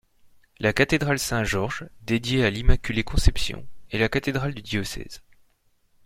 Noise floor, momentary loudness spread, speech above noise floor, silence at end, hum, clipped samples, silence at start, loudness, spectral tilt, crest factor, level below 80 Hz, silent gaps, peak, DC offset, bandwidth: -64 dBFS; 12 LU; 41 dB; 0.85 s; none; under 0.1%; 0.6 s; -25 LUFS; -5 dB/octave; 22 dB; -30 dBFS; none; -4 dBFS; under 0.1%; 16 kHz